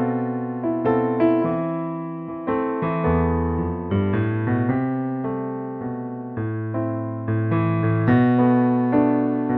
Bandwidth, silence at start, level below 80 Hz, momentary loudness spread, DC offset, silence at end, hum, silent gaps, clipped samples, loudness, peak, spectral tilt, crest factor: 4.1 kHz; 0 s; -42 dBFS; 11 LU; under 0.1%; 0 s; none; none; under 0.1%; -22 LUFS; -6 dBFS; -12.5 dB/octave; 16 dB